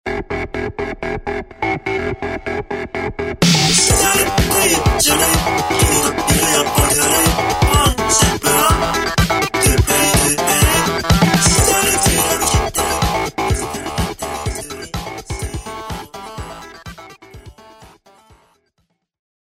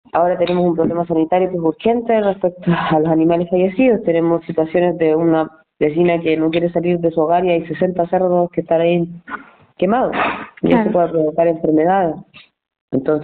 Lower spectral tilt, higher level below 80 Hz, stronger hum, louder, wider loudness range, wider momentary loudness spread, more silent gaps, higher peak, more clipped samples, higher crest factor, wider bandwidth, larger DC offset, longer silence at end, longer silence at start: second, -3 dB/octave vs -6.5 dB/octave; first, -26 dBFS vs -50 dBFS; neither; about the same, -15 LUFS vs -16 LUFS; first, 15 LU vs 2 LU; first, 15 LU vs 6 LU; second, none vs 12.81-12.88 s; first, 0 dBFS vs -4 dBFS; neither; about the same, 16 dB vs 12 dB; first, 16.5 kHz vs 4.5 kHz; neither; first, 1.6 s vs 0 s; about the same, 0.05 s vs 0.15 s